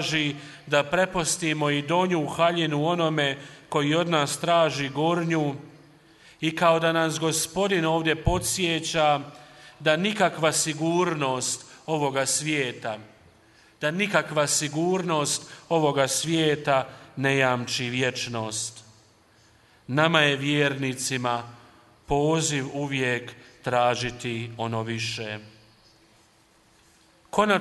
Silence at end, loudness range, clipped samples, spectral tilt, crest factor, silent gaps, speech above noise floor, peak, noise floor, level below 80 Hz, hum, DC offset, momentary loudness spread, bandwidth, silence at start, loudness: 0 s; 4 LU; under 0.1%; -4 dB/octave; 22 dB; none; 35 dB; -4 dBFS; -60 dBFS; -50 dBFS; none; under 0.1%; 9 LU; 12 kHz; 0 s; -25 LUFS